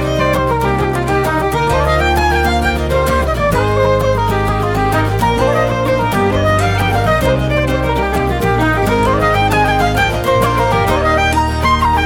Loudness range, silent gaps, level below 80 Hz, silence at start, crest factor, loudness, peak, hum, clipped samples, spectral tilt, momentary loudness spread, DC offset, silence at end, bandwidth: 1 LU; none; -22 dBFS; 0 s; 12 dB; -14 LUFS; 0 dBFS; none; under 0.1%; -6 dB/octave; 3 LU; under 0.1%; 0 s; 18.5 kHz